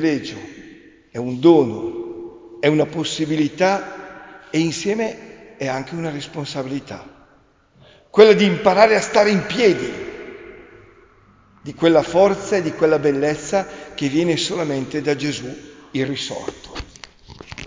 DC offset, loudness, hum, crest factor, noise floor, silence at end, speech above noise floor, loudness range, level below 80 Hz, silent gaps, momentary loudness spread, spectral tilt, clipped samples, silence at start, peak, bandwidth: under 0.1%; -18 LUFS; none; 20 dB; -55 dBFS; 0 s; 37 dB; 9 LU; -52 dBFS; none; 22 LU; -5 dB/octave; under 0.1%; 0 s; 0 dBFS; 7.6 kHz